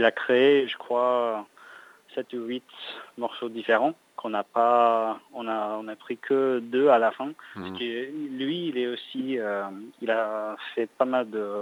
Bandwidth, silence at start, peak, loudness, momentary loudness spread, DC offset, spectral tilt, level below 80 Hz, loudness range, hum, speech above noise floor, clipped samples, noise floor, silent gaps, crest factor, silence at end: 18 kHz; 0 s; -6 dBFS; -26 LUFS; 15 LU; under 0.1%; -6 dB/octave; -84 dBFS; 6 LU; none; 24 dB; under 0.1%; -50 dBFS; none; 20 dB; 0 s